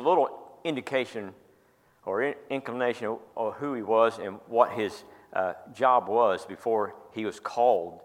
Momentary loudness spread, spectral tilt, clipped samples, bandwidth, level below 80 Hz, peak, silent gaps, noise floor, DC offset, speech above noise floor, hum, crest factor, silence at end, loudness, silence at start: 11 LU; -5.5 dB/octave; under 0.1%; 15.5 kHz; -76 dBFS; -6 dBFS; none; -63 dBFS; under 0.1%; 36 dB; none; 22 dB; 0 s; -28 LUFS; 0 s